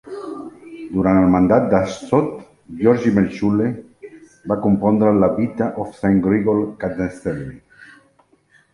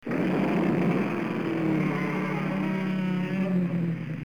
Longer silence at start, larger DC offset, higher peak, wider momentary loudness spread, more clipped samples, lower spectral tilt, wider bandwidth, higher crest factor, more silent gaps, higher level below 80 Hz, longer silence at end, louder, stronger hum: about the same, 0.05 s vs 0.05 s; second, under 0.1% vs 0.2%; first, -2 dBFS vs -14 dBFS; first, 18 LU vs 4 LU; neither; about the same, -8.5 dB/octave vs -8.5 dB/octave; about the same, 11 kHz vs 10.5 kHz; first, 18 dB vs 12 dB; neither; first, -46 dBFS vs -60 dBFS; first, 0.9 s vs 0.05 s; first, -18 LUFS vs -27 LUFS; neither